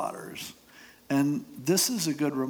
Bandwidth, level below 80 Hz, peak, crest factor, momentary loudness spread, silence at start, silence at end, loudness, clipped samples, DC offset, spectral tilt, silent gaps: over 20 kHz; -70 dBFS; -12 dBFS; 18 dB; 15 LU; 0 s; 0 s; -28 LUFS; under 0.1%; under 0.1%; -4 dB/octave; none